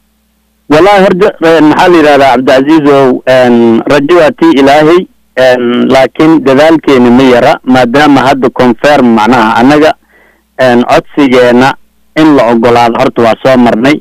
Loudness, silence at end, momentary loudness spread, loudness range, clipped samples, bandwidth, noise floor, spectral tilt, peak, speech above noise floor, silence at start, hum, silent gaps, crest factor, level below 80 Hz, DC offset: -5 LUFS; 0 s; 4 LU; 2 LU; 0.5%; 15 kHz; -52 dBFS; -6 dB/octave; 0 dBFS; 48 dB; 0.7 s; none; none; 4 dB; -36 dBFS; under 0.1%